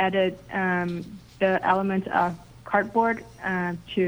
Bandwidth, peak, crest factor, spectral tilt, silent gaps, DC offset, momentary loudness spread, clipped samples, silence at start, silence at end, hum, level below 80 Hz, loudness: over 20 kHz; -8 dBFS; 18 dB; -7 dB/octave; none; under 0.1%; 8 LU; under 0.1%; 0 s; 0 s; none; -56 dBFS; -25 LUFS